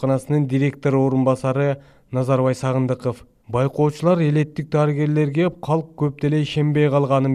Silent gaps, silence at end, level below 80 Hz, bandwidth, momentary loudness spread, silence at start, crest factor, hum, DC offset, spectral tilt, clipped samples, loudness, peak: none; 0 s; -54 dBFS; 11.5 kHz; 7 LU; 0 s; 14 dB; none; under 0.1%; -8 dB/octave; under 0.1%; -20 LUFS; -6 dBFS